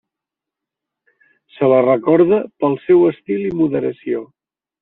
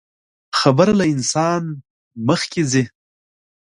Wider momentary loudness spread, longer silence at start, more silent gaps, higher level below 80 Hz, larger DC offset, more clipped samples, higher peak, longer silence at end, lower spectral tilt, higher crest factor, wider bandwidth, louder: second, 9 LU vs 12 LU; first, 1.6 s vs 0.55 s; second, none vs 1.90-2.11 s; second, -60 dBFS vs -54 dBFS; neither; neither; about the same, -2 dBFS vs 0 dBFS; second, 0.6 s vs 0.9 s; first, -7.5 dB/octave vs -5 dB/octave; about the same, 16 dB vs 18 dB; second, 4 kHz vs 11.5 kHz; about the same, -16 LUFS vs -18 LUFS